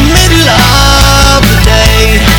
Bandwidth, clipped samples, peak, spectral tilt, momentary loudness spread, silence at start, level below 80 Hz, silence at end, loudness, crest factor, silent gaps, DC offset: over 20 kHz; 5%; 0 dBFS; -3.5 dB/octave; 1 LU; 0 s; -10 dBFS; 0 s; -5 LUFS; 4 dB; none; under 0.1%